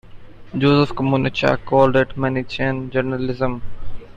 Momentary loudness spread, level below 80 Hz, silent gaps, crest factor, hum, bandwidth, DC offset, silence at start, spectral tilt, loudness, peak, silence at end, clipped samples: 12 LU; -38 dBFS; none; 18 dB; none; 7.6 kHz; under 0.1%; 0.05 s; -7.5 dB/octave; -19 LUFS; -2 dBFS; 0 s; under 0.1%